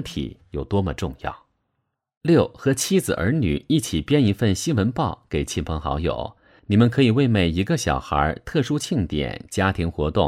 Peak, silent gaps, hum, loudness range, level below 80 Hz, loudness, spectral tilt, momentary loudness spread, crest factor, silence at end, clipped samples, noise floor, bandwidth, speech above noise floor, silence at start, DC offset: -4 dBFS; 2.17-2.21 s; none; 2 LU; -38 dBFS; -22 LUFS; -6 dB/octave; 10 LU; 16 dB; 0 s; under 0.1%; -76 dBFS; 16 kHz; 55 dB; 0 s; under 0.1%